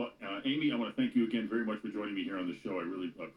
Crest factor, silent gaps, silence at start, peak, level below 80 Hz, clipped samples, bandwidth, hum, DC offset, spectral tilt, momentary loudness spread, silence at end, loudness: 14 dB; none; 0 s; -20 dBFS; -74 dBFS; under 0.1%; 9.4 kHz; none; under 0.1%; -7 dB/octave; 7 LU; 0.05 s; -35 LUFS